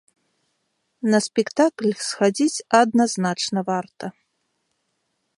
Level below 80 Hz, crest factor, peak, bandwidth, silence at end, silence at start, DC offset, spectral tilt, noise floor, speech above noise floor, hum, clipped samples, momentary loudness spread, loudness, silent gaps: -72 dBFS; 22 dB; -2 dBFS; 11.5 kHz; 1.3 s; 1.05 s; under 0.1%; -4.5 dB/octave; -73 dBFS; 53 dB; none; under 0.1%; 10 LU; -21 LUFS; none